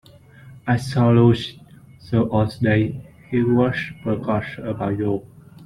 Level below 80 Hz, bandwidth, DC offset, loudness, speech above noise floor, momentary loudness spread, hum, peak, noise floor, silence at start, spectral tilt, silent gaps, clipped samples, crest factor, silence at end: -50 dBFS; 11.5 kHz; under 0.1%; -21 LUFS; 26 dB; 12 LU; none; -4 dBFS; -45 dBFS; 0.45 s; -8 dB/octave; none; under 0.1%; 18 dB; 0 s